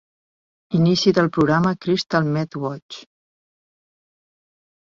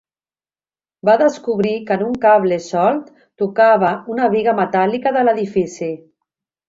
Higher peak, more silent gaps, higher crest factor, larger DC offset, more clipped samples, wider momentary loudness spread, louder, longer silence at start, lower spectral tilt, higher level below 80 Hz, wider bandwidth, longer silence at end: about the same, -4 dBFS vs -2 dBFS; first, 2.82-2.89 s vs none; about the same, 18 dB vs 16 dB; neither; neither; first, 15 LU vs 10 LU; second, -20 LUFS vs -16 LUFS; second, 0.7 s vs 1.05 s; about the same, -6.5 dB/octave vs -6.5 dB/octave; about the same, -56 dBFS vs -60 dBFS; about the same, 7.6 kHz vs 7.8 kHz; first, 1.85 s vs 0.7 s